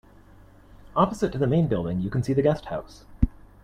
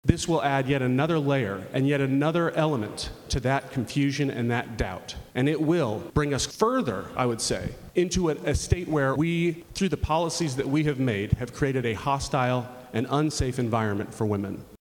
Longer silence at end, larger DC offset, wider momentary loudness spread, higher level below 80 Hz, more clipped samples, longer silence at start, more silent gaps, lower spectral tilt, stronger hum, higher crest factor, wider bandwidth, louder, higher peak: first, 0.35 s vs 0.05 s; neither; about the same, 8 LU vs 6 LU; about the same, -38 dBFS vs -42 dBFS; neither; first, 0.75 s vs 0.05 s; neither; first, -8 dB/octave vs -5.5 dB/octave; neither; about the same, 22 dB vs 24 dB; second, 12 kHz vs 18 kHz; about the same, -25 LUFS vs -26 LUFS; about the same, -4 dBFS vs -2 dBFS